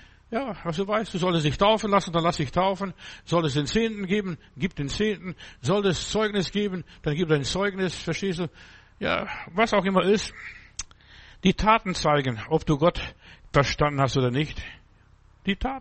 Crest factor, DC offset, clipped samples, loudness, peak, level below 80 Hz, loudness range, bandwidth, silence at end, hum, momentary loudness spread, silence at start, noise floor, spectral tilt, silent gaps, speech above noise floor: 20 dB; under 0.1%; under 0.1%; -25 LUFS; -6 dBFS; -44 dBFS; 3 LU; 8.8 kHz; 0 s; none; 13 LU; 0.3 s; -56 dBFS; -5.5 dB/octave; none; 31 dB